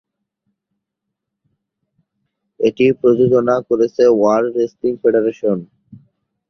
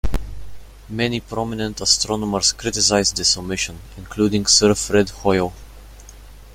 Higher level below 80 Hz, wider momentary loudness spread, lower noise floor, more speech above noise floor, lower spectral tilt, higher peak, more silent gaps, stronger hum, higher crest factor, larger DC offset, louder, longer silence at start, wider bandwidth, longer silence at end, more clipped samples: second, -58 dBFS vs -34 dBFS; second, 7 LU vs 14 LU; first, -79 dBFS vs -40 dBFS; first, 65 dB vs 21 dB; first, -7.5 dB/octave vs -3 dB/octave; about the same, -2 dBFS vs 0 dBFS; neither; neither; about the same, 16 dB vs 20 dB; neither; first, -15 LUFS vs -18 LUFS; first, 2.6 s vs 0.05 s; second, 6.4 kHz vs 16.5 kHz; first, 0.5 s vs 0 s; neither